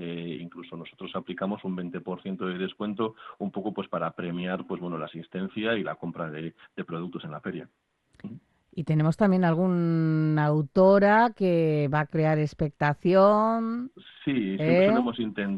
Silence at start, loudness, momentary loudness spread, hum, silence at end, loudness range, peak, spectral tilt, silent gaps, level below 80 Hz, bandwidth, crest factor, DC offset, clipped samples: 0 s; -26 LUFS; 17 LU; none; 0 s; 11 LU; -8 dBFS; -9 dB/octave; none; -62 dBFS; 8 kHz; 18 dB; under 0.1%; under 0.1%